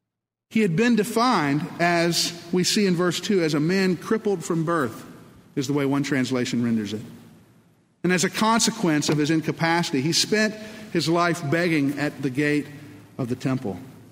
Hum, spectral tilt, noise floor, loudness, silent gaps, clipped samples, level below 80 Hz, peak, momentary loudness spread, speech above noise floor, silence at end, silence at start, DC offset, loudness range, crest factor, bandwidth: none; -4.5 dB/octave; -84 dBFS; -23 LUFS; none; under 0.1%; -64 dBFS; -6 dBFS; 10 LU; 62 dB; 0.15 s; 0.5 s; under 0.1%; 4 LU; 18 dB; 16 kHz